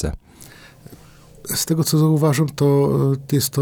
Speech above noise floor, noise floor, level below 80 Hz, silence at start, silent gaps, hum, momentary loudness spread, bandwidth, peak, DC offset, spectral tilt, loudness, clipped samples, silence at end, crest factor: 28 dB; -45 dBFS; -40 dBFS; 0 s; none; none; 11 LU; over 20 kHz; -6 dBFS; under 0.1%; -6 dB/octave; -18 LUFS; under 0.1%; 0 s; 14 dB